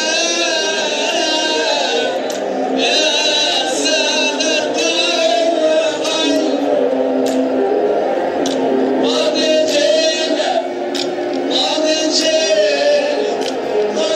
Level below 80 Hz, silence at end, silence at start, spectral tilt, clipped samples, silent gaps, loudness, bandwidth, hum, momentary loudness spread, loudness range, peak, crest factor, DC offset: -66 dBFS; 0 s; 0 s; -1.5 dB/octave; under 0.1%; none; -15 LUFS; 14 kHz; none; 5 LU; 2 LU; -2 dBFS; 14 dB; under 0.1%